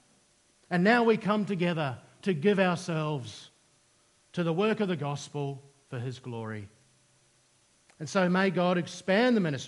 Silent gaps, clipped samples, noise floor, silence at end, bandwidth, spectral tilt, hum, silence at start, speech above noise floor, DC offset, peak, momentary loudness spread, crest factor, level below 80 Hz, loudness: none; under 0.1%; -66 dBFS; 0 s; 11.5 kHz; -6 dB/octave; none; 0.7 s; 38 dB; under 0.1%; -10 dBFS; 15 LU; 20 dB; -76 dBFS; -28 LUFS